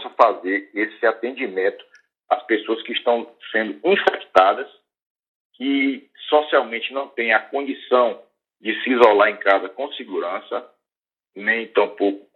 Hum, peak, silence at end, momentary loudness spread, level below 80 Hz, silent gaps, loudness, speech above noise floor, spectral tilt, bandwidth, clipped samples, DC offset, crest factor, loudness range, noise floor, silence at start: none; 0 dBFS; 0.15 s; 11 LU; -70 dBFS; 5.02-5.15 s, 5.28-5.50 s; -20 LUFS; over 70 dB; -5 dB/octave; 7 kHz; under 0.1%; under 0.1%; 20 dB; 3 LU; under -90 dBFS; 0 s